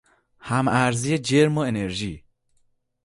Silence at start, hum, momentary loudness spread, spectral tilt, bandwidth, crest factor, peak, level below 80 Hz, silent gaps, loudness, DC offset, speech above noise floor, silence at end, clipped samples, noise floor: 0.45 s; none; 14 LU; -5.5 dB/octave; 11.5 kHz; 18 dB; -6 dBFS; -52 dBFS; none; -22 LUFS; under 0.1%; 44 dB; 0.85 s; under 0.1%; -66 dBFS